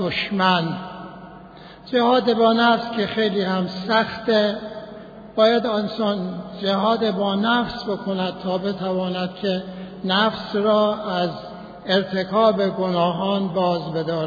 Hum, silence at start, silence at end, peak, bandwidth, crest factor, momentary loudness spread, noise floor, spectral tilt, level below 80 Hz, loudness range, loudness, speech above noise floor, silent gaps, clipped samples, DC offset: none; 0 s; 0 s; -4 dBFS; 5 kHz; 18 dB; 15 LU; -42 dBFS; -7 dB/octave; -56 dBFS; 3 LU; -21 LUFS; 21 dB; none; under 0.1%; under 0.1%